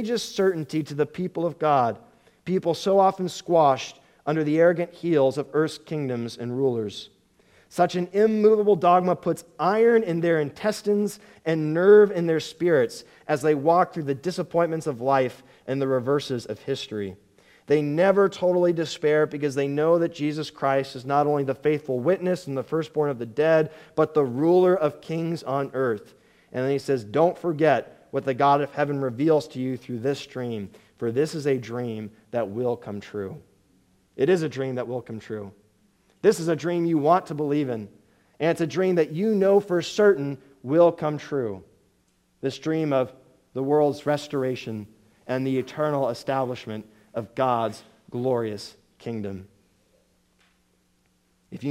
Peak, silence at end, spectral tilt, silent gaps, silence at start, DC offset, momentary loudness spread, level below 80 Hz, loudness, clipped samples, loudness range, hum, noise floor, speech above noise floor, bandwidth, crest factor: -6 dBFS; 0 s; -6.5 dB/octave; none; 0 s; under 0.1%; 14 LU; -68 dBFS; -24 LUFS; under 0.1%; 7 LU; none; -66 dBFS; 43 dB; 14.5 kHz; 18 dB